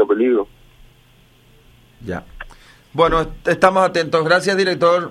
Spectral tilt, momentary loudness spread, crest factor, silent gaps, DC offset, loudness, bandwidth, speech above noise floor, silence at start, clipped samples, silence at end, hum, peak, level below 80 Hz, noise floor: -5 dB/octave; 20 LU; 18 dB; none; under 0.1%; -16 LUFS; 13 kHz; 35 dB; 0 s; under 0.1%; 0 s; none; 0 dBFS; -40 dBFS; -51 dBFS